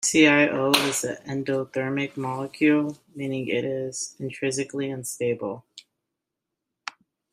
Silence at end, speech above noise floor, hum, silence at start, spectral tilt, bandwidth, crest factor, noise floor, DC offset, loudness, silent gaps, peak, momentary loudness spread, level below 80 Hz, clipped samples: 0.4 s; 60 dB; none; 0 s; -3.5 dB/octave; 15.5 kHz; 24 dB; -85 dBFS; under 0.1%; -25 LUFS; none; -2 dBFS; 14 LU; -68 dBFS; under 0.1%